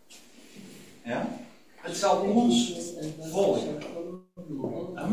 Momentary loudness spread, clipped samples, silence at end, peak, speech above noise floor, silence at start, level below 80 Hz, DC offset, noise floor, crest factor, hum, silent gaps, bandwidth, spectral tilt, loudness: 21 LU; under 0.1%; 0 s; -10 dBFS; 25 dB; 0.1 s; -64 dBFS; 0.2%; -53 dBFS; 20 dB; none; none; 16 kHz; -4.5 dB/octave; -28 LUFS